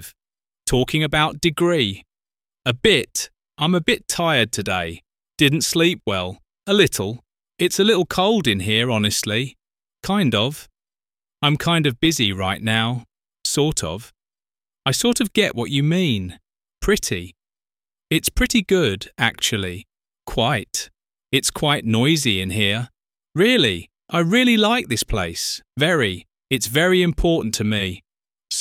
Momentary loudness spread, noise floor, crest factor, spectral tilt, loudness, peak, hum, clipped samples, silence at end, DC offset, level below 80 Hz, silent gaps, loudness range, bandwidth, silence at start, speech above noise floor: 12 LU; under -90 dBFS; 20 dB; -4 dB/octave; -19 LUFS; -2 dBFS; none; under 0.1%; 0 s; under 0.1%; -40 dBFS; none; 3 LU; 17 kHz; 0 s; over 71 dB